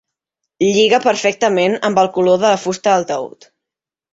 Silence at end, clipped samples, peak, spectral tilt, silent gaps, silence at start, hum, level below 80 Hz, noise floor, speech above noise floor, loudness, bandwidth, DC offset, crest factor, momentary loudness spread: 0.85 s; under 0.1%; -2 dBFS; -4 dB/octave; none; 0.6 s; none; -62 dBFS; -85 dBFS; 71 dB; -15 LUFS; 8 kHz; under 0.1%; 14 dB; 7 LU